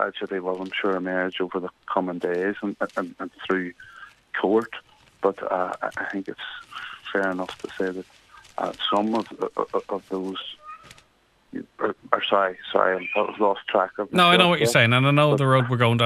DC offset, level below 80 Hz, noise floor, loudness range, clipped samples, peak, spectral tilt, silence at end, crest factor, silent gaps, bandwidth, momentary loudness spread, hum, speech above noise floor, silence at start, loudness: under 0.1%; -66 dBFS; -62 dBFS; 9 LU; under 0.1%; -2 dBFS; -5.5 dB/octave; 0 s; 22 dB; none; 14 kHz; 18 LU; none; 38 dB; 0 s; -23 LUFS